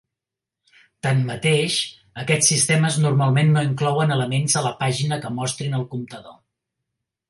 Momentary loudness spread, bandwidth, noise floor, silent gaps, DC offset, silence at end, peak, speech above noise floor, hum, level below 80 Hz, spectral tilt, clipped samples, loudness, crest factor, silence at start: 12 LU; 11.5 kHz; -86 dBFS; none; under 0.1%; 0.95 s; -4 dBFS; 66 dB; none; -60 dBFS; -4 dB/octave; under 0.1%; -20 LUFS; 18 dB; 1.05 s